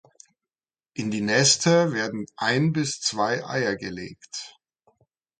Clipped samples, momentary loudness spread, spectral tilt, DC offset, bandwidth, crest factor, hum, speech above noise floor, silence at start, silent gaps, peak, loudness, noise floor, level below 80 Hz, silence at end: under 0.1%; 18 LU; -3.5 dB/octave; under 0.1%; 9.6 kHz; 20 dB; none; over 66 dB; 0.95 s; none; -6 dBFS; -23 LUFS; under -90 dBFS; -64 dBFS; 0.9 s